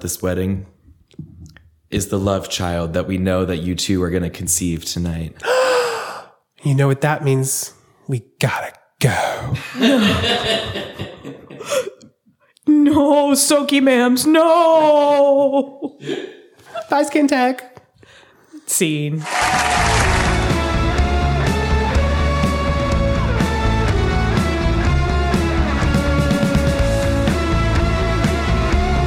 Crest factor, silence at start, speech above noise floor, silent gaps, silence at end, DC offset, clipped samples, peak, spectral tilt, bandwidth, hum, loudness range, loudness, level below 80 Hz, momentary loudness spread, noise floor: 14 dB; 0 s; 40 dB; none; 0 s; under 0.1%; under 0.1%; -2 dBFS; -5 dB/octave; 19 kHz; none; 6 LU; -17 LUFS; -26 dBFS; 13 LU; -57 dBFS